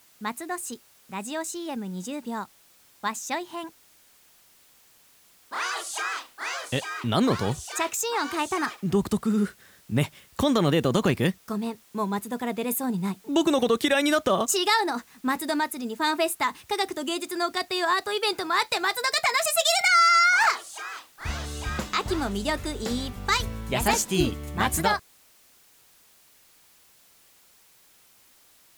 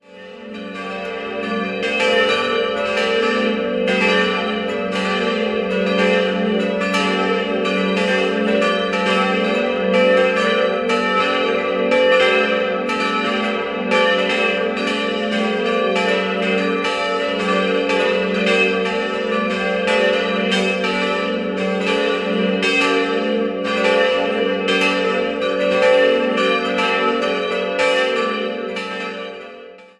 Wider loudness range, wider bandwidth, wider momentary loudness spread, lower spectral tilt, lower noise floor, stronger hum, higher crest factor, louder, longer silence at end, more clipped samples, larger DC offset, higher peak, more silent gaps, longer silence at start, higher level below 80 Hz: first, 13 LU vs 2 LU; first, over 20 kHz vs 11.5 kHz; first, 12 LU vs 6 LU; about the same, -3.5 dB/octave vs -4.5 dB/octave; first, -57 dBFS vs -39 dBFS; neither; about the same, 18 dB vs 16 dB; second, -26 LUFS vs -18 LUFS; first, 3.75 s vs 0.15 s; neither; neither; second, -8 dBFS vs -2 dBFS; neither; about the same, 0.2 s vs 0.1 s; first, -46 dBFS vs -54 dBFS